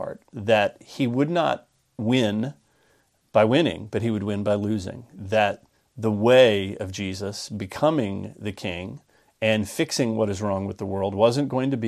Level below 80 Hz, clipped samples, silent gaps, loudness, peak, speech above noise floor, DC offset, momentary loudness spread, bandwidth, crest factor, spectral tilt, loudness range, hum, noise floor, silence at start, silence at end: -60 dBFS; under 0.1%; none; -24 LUFS; -4 dBFS; 41 dB; under 0.1%; 13 LU; 14.5 kHz; 20 dB; -5.5 dB/octave; 4 LU; none; -64 dBFS; 0 s; 0 s